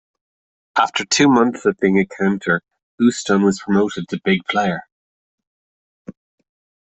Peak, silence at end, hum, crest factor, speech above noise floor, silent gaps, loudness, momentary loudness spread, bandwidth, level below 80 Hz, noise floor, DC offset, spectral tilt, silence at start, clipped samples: -2 dBFS; 0.85 s; none; 18 dB; over 73 dB; 2.83-2.98 s, 4.92-5.38 s, 5.47-6.05 s; -18 LUFS; 8 LU; 8.4 kHz; -58 dBFS; under -90 dBFS; under 0.1%; -4.5 dB/octave; 0.75 s; under 0.1%